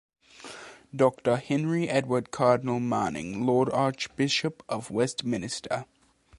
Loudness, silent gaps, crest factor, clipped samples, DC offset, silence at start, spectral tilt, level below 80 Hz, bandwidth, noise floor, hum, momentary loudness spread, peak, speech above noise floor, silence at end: -27 LUFS; none; 20 dB; under 0.1%; under 0.1%; 0.4 s; -5.5 dB/octave; -62 dBFS; 11.5 kHz; -46 dBFS; none; 14 LU; -8 dBFS; 19 dB; 0.55 s